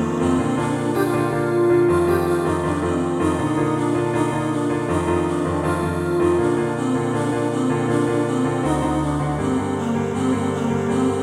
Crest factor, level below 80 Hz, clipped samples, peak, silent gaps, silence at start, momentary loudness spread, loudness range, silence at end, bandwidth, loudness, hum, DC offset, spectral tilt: 12 dB; -42 dBFS; under 0.1%; -6 dBFS; none; 0 s; 4 LU; 2 LU; 0 s; 13.5 kHz; -20 LUFS; none; under 0.1%; -7 dB/octave